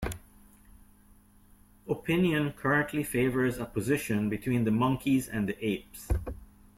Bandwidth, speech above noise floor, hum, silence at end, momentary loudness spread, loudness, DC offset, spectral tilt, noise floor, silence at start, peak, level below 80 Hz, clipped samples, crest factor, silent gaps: 16.5 kHz; 30 dB; none; 0.35 s; 10 LU; -29 LUFS; under 0.1%; -6 dB/octave; -59 dBFS; 0 s; -14 dBFS; -46 dBFS; under 0.1%; 16 dB; none